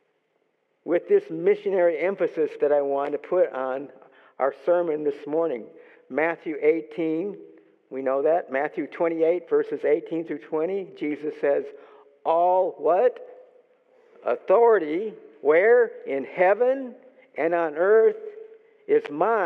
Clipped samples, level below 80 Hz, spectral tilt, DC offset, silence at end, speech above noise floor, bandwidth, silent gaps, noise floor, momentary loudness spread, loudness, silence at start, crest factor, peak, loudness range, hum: under 0.1%; under -90 dBFS; -8 dB/octave; under 0.1%; 0 s; 48 dB; 4.5 kHz; none; -71 dBFS; 12 LU; -24 LUFS; 0.85 s; 16 dB; -8 dBFS; 5 LU; none